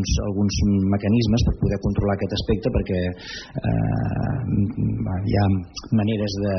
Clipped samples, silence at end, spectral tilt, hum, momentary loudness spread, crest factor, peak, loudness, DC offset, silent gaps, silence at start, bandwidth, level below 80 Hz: under 0.1%; 0 s; -7 dB/octave; none; 5 LU; 12 dB; -10 dBFS; -23 LUFS; under 0.1%; none; 0 s; 6.4 kHz; -32 dBFS